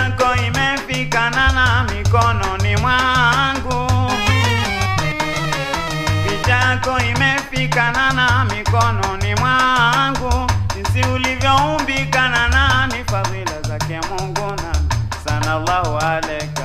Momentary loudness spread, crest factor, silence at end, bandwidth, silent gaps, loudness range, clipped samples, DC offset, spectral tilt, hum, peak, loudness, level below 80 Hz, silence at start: 7 LU; 16 dB; 0 s; 15 kHz; none; 3 LU; under 0.1%; under 0.1%; -4.5 dB/octave; none; 0 dBFS; -17 LUFS; -28 dBFS; 0 s